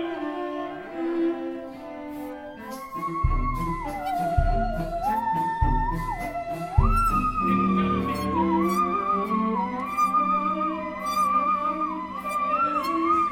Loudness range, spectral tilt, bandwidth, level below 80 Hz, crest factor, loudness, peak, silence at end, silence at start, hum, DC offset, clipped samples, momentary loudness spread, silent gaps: 6 LU; -7 dB/octave; 17 kHz; -34 dBFS; 20 dB; -25 LUFS; -6 dBFS; 0 s; 0 s; none; under 0.1%; under 0.1%; 12 LU; none